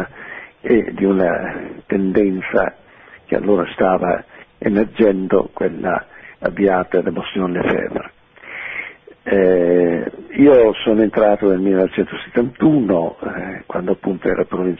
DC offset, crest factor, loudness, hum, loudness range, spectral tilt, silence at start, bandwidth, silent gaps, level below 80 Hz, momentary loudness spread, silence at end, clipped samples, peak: under 0.1%; 16 dB; -17 LUFS; none; 5 LU; -10 dB/octave; 0 s; 3.9 kHz; none; -46 dBFS; 13 LU; 0.05 s; under 0.1%; -2 dBFS